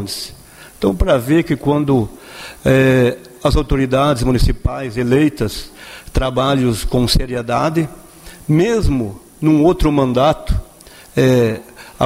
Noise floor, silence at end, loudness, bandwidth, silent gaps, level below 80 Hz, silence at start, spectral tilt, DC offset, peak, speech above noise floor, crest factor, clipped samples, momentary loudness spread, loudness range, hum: -41 dBFS; 0 s; -16 LUFS; 16 kHz; none; -26 dBFS; 0 s; -6.5 dB/octave; under 0.1%; -2 dBFS; 26 dB; 14 dB; under 0.1%; 12 LU; 2 LU; none